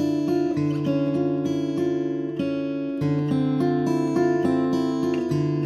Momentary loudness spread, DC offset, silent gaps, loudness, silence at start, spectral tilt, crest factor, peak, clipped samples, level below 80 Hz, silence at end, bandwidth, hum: 5 LU; under 0.1%; none; -24 LUFS; 0 s; -8 dB/octave; 12 dB; -10 dBFS; under 0.1%; -64 dBFS; 0 s; 12 kHz; none